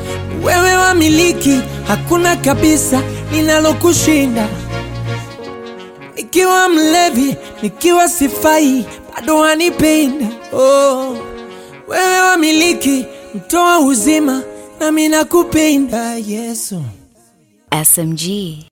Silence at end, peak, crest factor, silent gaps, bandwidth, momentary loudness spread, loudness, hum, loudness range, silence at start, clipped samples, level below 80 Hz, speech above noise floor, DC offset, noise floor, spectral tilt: 0.1 s; 0 dBFS; 14 dB; none; 17 kHz; 16 LU; -13 LUFS; none; 3 LU; 0 s; under 0.1%; -38 dBFS; 39 dB; under 0.1%; -51 dBFS; -3.5 dB/octave